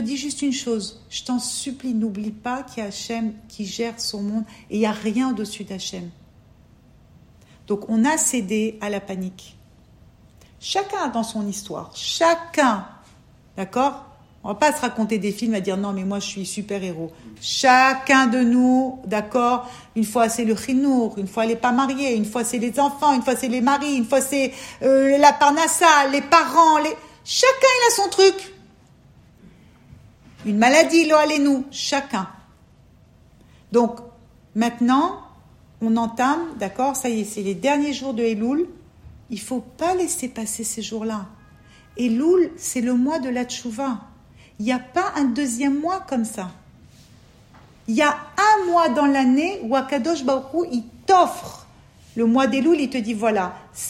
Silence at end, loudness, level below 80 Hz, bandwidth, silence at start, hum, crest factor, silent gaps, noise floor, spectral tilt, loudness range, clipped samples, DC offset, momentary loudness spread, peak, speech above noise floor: 0 s; -20 LUFS; -58 dBFS; 16 kHz; 0 s; none; 20 dB; none; -52 dBFS; -3.5 dB/octave; 9 LU; under 0.1%; under 0.1%; 15 LU; 0 dBFS; 32 dB